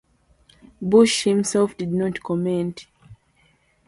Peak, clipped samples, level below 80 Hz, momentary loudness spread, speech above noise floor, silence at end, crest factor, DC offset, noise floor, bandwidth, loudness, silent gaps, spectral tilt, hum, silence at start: -4 dBFS; under 0.1%; -58 dBFS; 13 LU; 41 dB; 0.75 s; 20 dB; under 0.1%; -61 dBFS; 11.5 kHz; -21 LUFS; none; -5 dB/octave; none; 0.8 s